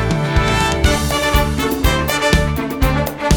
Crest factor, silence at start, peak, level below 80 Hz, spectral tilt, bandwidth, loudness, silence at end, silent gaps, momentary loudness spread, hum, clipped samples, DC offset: 14 dB; 0 s; 0 dBFS; -22 dBFS; -4.5 dB/octave; over 20 kHz; -16 LUFS; 0 s; none; 3 LU; none; under 0.1%; under 0.1%